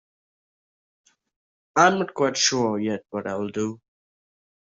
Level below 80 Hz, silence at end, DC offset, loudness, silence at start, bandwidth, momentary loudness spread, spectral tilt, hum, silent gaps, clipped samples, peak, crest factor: -68 dBFS; 1 s; under 0.1%; -23 LUFS; 1.75 s; 7.8 kHz; 11 LU; -3 dB/octave; none; none; under 0.1%; -4 dBFS; 24 dB